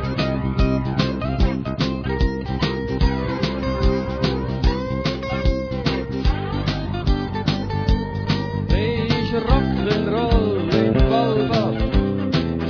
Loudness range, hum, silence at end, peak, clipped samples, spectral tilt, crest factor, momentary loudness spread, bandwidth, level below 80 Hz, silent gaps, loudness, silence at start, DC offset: 4 LU; none; 0 s; -2 dBFS; under 0.1%; -7.5 dB/octave; 18 dB; 4 LU; 5.4 kHz; -26 dBFS; none; -21 LUFS; 0 s; under 0.1%